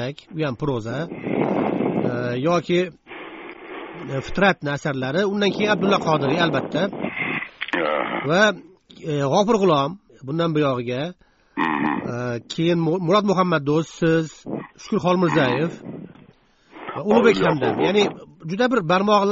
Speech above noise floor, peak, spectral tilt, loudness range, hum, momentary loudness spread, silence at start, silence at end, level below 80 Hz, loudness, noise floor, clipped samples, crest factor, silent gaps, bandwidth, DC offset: 34 dB; -2 dBFS; -4.5 dB/octave; 3 LU; none; 16 LU; 0 s; 0 s; -52 dBFS; -21 LUFS; -54 dBFS; under 0.1%; 20 dB; none; 7.6 kHz; under 0.1%